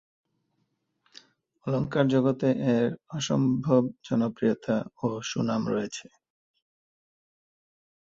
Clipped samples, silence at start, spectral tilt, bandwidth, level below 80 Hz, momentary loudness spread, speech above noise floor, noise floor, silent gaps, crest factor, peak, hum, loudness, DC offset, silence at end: under 0.1%; 1.65 s; -6.5 dB/octave; 7.8 kHz; -64 dBFS; 8 LU; 50 dB; -76 dBFS; none; 20 dB; -8 dBFS; none; -27 LUFS; under 0.1%; 2.05 s